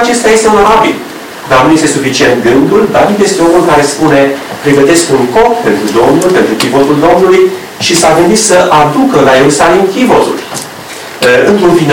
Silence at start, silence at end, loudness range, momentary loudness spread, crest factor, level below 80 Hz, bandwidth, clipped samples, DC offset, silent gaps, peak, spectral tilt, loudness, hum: 0 s; 0 s; 1 LU; 7 LU; 6 dB; -36 dBFS; 19.5 kHz; under 0.1%; under 0.1%; none; 0 dBFS; -4 dB/octave; -6 LUFS; none